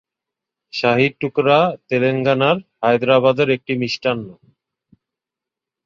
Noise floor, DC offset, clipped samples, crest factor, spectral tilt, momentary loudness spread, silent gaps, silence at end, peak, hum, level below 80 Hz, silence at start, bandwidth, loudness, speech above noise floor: -86 dBFS; under 0.1%; under 0.1%; 18 dB; -6.5 dB/octave; 7 LU; none; 1.55 s; -2 dBFS; none; -60 dBFS; 0.75 s; 7.2 kHz; -17 LUFS; 69 dB